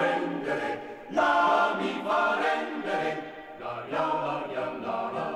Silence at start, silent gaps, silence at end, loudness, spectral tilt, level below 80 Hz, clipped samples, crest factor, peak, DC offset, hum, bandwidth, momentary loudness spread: 0 s; none; 0 s; -28 LUFS; -5 dB/octave; -70 dBFS; under 0.1%; 16 dB; -12 dBFS; under 0.1%; none; 12.5 kHz; 14 LU